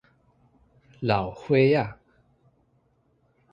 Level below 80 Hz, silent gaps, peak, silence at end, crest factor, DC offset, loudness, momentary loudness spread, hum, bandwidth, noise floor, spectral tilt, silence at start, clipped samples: -56 dBFS; none; -6 dBFS; 1.6 s; 22 dB; under 0.1%; -24 LUFS; 11 LU; none; 7.2 kHz; -67 dBFS; -8.5 dB/octave; 1 s; under 0.1%